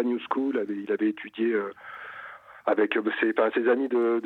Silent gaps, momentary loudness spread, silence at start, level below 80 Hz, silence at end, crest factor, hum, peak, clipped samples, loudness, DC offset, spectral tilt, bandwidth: none; 16 LU; 0 s; -78 dBFS; 0 s; 18 dB; none; -8 dBFS; under 0.1%; -26 LUFS; under 0.1%; -7 dB/octave; 4.2 kHz